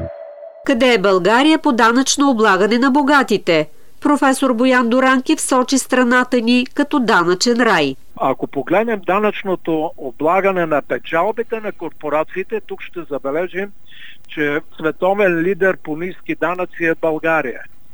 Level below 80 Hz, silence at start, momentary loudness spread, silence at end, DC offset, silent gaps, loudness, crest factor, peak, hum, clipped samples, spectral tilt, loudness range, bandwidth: -52 dBFS; 0 s; 12 LU; 0.25 s; 3%; none; -16 LUFS; 16 dB; 0 dBFS; none; under 0.1%; -4 dB/octave; 8 LU; over 20 kHz